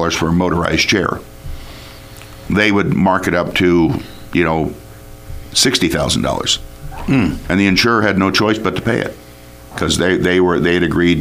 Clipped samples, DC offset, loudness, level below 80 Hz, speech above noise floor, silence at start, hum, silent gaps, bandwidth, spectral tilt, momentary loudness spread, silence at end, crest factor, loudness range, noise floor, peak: under 0.1%; under 0.1%; -15 LUFS; -34 dBFS; 23 dB; 0 s; 60 Hz at -40 dBFS; none; 16 kHz; -4.5 dB/octave; 20 LU; 0 s; 16 dB; 2 LU; -37 dBFS; 0 dBFS